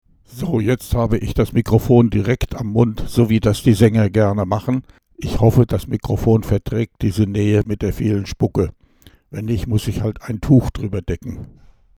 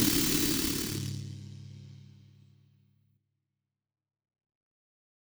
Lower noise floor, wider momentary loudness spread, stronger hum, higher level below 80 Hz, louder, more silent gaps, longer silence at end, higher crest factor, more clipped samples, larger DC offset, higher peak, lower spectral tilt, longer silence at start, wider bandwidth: second, -50 dBFS vs -87 dBFS; second, 11 LU vs 24 LU; neither; first, -32 dBFS vs -54 dBFS; first, -18 LUFS vs -29 LUFS; neither; second, 0.55 s vs 3.25 s; about the same, 18 dB vs 22 dB; neither; neither; first, 0 dBFS vs -14 dBFS; first, -7.5 dB/octave vs -3 dB/octave; first, 0.3 s vs 0 s; second, 16 kHz vs over 20 kHz